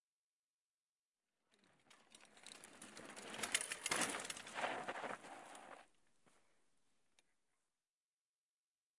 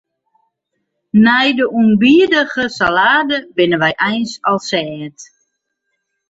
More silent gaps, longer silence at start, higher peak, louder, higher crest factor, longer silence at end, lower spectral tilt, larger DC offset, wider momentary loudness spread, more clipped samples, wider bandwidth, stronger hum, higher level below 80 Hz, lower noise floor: neither; first, 1.9 s vs 1.15 s; second, -22 dBFS vs 0 dBFS; second, -43 LUFS vs -13 LUFS; first, 28 dB vs 14 dB; first, 2.7 s vs 1.05 s; second, -0.5 dB/octave vs -5 dB/octave; neither; first, 21 LU vs 9 LU; neither; first, 12 kHz vs 8 kHz; neither; second, -88 dBFS vs -54 dBFS; first, under -90 dBFS vs -72 dBFS